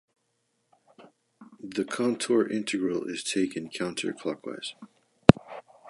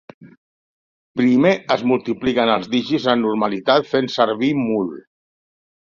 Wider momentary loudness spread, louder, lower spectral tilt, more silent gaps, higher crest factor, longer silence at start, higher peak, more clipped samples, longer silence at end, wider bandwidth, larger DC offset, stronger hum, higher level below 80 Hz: first, 17 LU vs 6 LU; second, -27 LUFS vs -18 LUFS; about the same, -5.5 dB/octave vs -6 dB/octave; second, none vs 0.38-1.15 s; first, 28 dB vs 18 dB; first, 1 s vs 0.2 s; about the same, 0 dBFS vs -2 dBFS; neither; second, 0 s vs 0.95 s; first, 11.5 kHz vs 7.2 kHz; neither; neither; first, -52 dBFS vs -58 dBFS